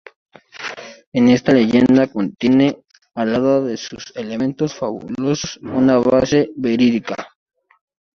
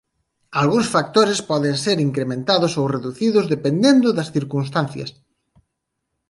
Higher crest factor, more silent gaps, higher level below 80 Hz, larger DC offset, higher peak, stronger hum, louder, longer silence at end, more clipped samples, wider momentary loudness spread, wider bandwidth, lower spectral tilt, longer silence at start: about the same, 16 dB vs 18 dB; first, 1.07-1.12 s vs none; first, -52 dBFS vs -60 dBFS; neither; about the same, -2 dBFS vs -2 dBFS; neither; about the same, -17 LUFS vs -19 LUFS; second, 0.95 s vs 1.2 s; neither; first, 16 LU vs 8 LU; second, 6.8 kHz vs 11.5 kHz; about the same, -6 dB/octave vs -5.5 dB/octave; about the same, 0.55 s vs 0.5 s